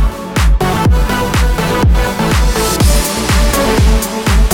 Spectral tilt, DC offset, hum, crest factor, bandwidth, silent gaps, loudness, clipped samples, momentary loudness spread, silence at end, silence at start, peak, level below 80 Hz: -4.5 dB/octave; under 0.1%; none; 10 dB; 18 kHz; none; -13 LUFS; under 0.1%; 3 LU; 0 s; 0 s; 0 dBFS; -14 dBFS